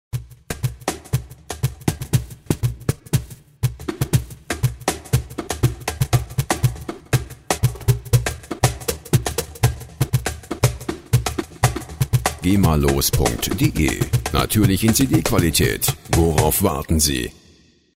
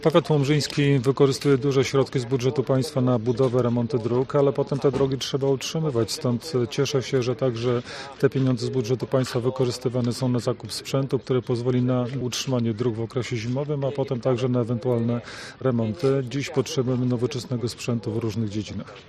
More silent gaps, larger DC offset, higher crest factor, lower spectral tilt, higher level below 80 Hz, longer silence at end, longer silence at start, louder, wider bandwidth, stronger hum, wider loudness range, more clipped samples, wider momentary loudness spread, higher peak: neither; neither; about the same, 18 dB vs 18 dB; second, -5 dB/octave vs -6.5 dB/octave; first, -32 dBFS vs -56 dBFS; first, 0.65 s vs 0.05 s; first, 0.15 s vs 0 s; first, -21 LUFS vs -24 LUFS; first, 16.5 kHz vs 14 kHz; neither; first, 6 LU vs 3 LU; neither; first, 10 LU vs 6 LU; about the same, -2 dBFS vs -4 dBFS